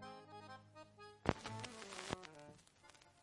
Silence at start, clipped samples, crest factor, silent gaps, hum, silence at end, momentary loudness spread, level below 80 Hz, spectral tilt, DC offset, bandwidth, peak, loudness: 0 s; under 0.1%; 36 dB; none; none; 0 s; 21 LU; -66 dBFS; -4.5 dB/octave; under 0.1%; 11.5 kHz; -14 dBFS; -48 LUFS